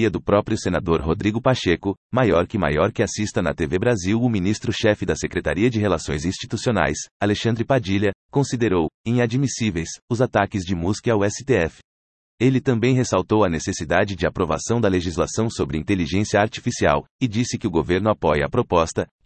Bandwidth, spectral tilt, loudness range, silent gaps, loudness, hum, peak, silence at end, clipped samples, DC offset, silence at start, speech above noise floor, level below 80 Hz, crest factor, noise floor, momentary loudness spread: 8.8 kHz; -5.5 dB/octave; 1 LU; 1.97-2.10 s, 7.11-7.20 s, 8.15-8.29 s, 8.94-9.04 s, 10.02-10.08 s, 11.84-12.38 s, 17.11-17.19 s; -21 LUFS; none; -4 dBFS; 0.2 s; under 0.1%; under 0.1%; 0 s; over 69 dB; -44 dBFS; 18 dB; under -90 dBFS; 4 LU